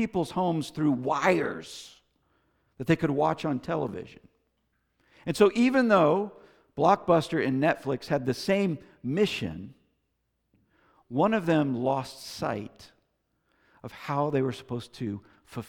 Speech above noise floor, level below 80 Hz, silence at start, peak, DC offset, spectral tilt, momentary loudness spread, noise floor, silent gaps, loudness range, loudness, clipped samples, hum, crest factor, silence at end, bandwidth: 50 dB; -62 dBFS; 0 s; -8 dBFS; under 0.1%; -6.5 dB/octave; 19 LU; -77 dBFS; none; 7 LU; -27 LUFS; under 0.1%; none; 20 dB; 0.05 s; 18 kHz